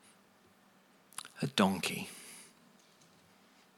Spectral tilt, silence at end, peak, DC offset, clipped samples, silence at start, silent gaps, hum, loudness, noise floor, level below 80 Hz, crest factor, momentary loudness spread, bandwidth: -4 dB/octave; 1.3 s; -12 dBFS; under 0.1%; under 0.1%; 1.15 s; none; none; -35 LUFS; -65 dBFS; -82 dBFS; 28 dB; 22 LU; 17 kHz